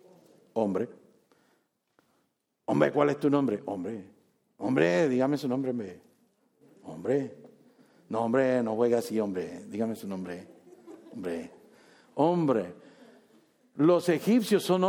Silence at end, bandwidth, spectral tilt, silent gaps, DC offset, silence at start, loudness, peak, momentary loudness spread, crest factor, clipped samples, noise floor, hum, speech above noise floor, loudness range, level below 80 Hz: 0 s; 18.5 kHz; -6.5 dB/octave; none; under 0.1%; 0.55 s; -28 LUFS; -8 dBFS; 16 LU; 20 dB; under 0.1%; -76 dBFS; none; 49 dB; 5 LU; -76 dBFS